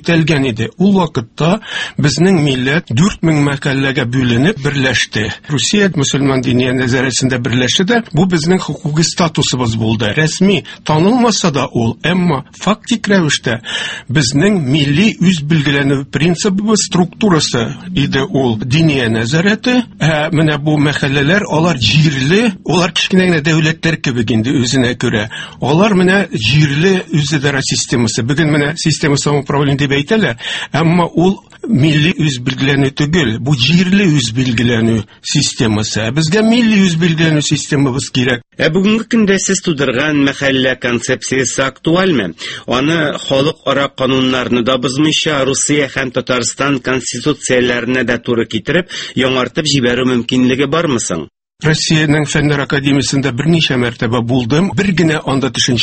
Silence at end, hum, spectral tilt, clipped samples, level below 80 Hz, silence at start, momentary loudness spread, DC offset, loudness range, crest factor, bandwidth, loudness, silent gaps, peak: 0 s; none; -5 dB/octave; under 0.1%; -40 dBFS; 0.05 s; 5 LU; under 0.1%; 2 LU; 12 dB; 8.8 kHz; -13 LUFS; none; 0 dBFS